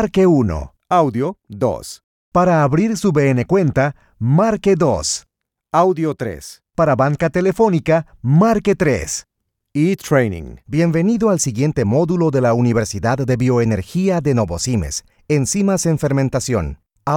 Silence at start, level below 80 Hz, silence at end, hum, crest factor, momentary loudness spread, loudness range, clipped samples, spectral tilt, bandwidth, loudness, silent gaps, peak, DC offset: 0 s; -40 dBFS; 0 s; none; 14 dB; 10 LU; 2 LU; under 0.1%; -6 dB/octave; 17 kHz; -17 LUFS; 2.04-2.32 s; -2 dBFS; under 0.1%